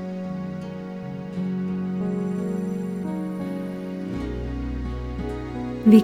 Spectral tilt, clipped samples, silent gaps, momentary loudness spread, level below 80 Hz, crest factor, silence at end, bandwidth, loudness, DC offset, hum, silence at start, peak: -8.5 dB/octave; under 0.1%; none; 6 LU; -38 dBFS; 22 dB; 0 s; 14 kHz; -28 LUFS; under 0.1%; none; 0 s; -2 dBFS